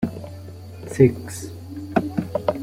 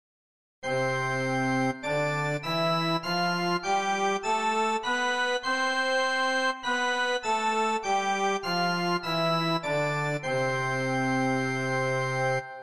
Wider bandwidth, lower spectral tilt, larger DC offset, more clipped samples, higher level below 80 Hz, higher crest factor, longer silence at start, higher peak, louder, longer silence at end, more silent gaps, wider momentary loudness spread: first, 16 kHz vs 14 kHz; first, -7.5 dB/octave vs -4.5 dB/octave; second, under 0.1% vs 0.3%; neither; first, -52 dBFS vs -64 dBFS; first, 22 dB vs 12 dB; second, 0 s vs 0.6 s; first, -2 dBFS vs -14 dBFS; first, -23 LUFS vs -27 LUFS; about the same, 0 s vs 0 s; neither; first, 20 LU vs 2 LU